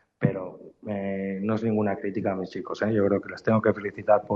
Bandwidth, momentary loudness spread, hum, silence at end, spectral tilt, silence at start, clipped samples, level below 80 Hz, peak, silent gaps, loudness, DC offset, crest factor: 7.2 kHz; 10 LU; none; 0 s; -9 dB/octave; 0.2 s; under 0.1%; -64 dBFS; -8 dBFS; none; -27 LUFS; under 0.1%; 18 dB